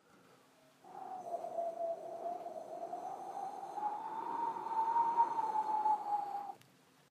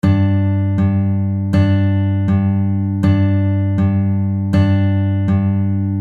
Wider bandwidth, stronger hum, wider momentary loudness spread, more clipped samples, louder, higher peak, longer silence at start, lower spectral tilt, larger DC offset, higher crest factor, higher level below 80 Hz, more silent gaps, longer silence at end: first, 14.5 kHz vs 4.7 kHz; neither; first, 13 LU vs 3 LU; neither; second, -38 LUFS vs -16 LUFS; second, -20 dBFS vs -2 dBFS; first, 0.85 s vs 0.05 s; second, -4.5 dB/octave vs -10 dB/octave; neither; first, 20 dB vs 12 dB; second, under -90 dBFS vs -42 dBFS; neither; first, 0.55 s vs 0 s